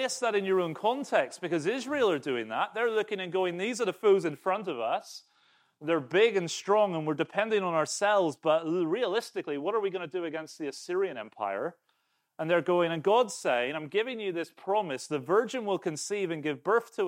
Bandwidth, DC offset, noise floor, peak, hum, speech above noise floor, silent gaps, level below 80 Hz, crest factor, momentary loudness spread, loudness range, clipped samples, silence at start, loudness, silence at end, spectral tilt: 16 kHz; under 0.1%; -75 dBFS; -10 dBFS; none; 46 dB; none; -86 dBFS; 18 dB; 9 LU; 4 LU; under 0.1%; 0 s; -29 LUFS; 0 s; -4.5 dB/octave